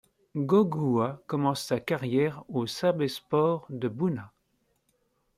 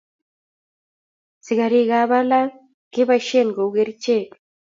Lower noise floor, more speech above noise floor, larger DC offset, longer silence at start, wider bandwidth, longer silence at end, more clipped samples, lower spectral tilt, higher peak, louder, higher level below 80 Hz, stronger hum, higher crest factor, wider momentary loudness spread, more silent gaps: second, -73 dBFS vs under -90 dBFS; second, 46 dB vs over 72 dB; neither; second, 0.35 s vs 1.45 s; first, 16 kHz vs 7.6 kHz; first, 1.1 s vs 0.4 s; neither; first, -6.5 dB/octave vs -5 dB/octave; second, -12 dBFS vs -4 dBFS; second, -28 LUFS vs -19 LUFS; first, -68 dBFS vs -74 dBFS; neither; about the same, 18 dB vs 16 dB; about the same, 9 LU vs 8 LU; second, none vs 2.74-2.91 s